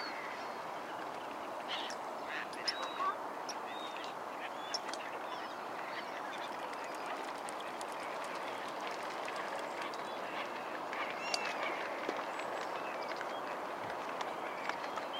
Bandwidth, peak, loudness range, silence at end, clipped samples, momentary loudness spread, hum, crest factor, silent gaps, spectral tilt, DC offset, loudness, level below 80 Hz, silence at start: 16.5 kHz; -16 dBFS; 3 LU; 0 s; under 0.1%; 5 LU; none; 26 dB; none; -2 dB/octave; under 0.1%; -40 LUFS; -84 dBFS; 0 s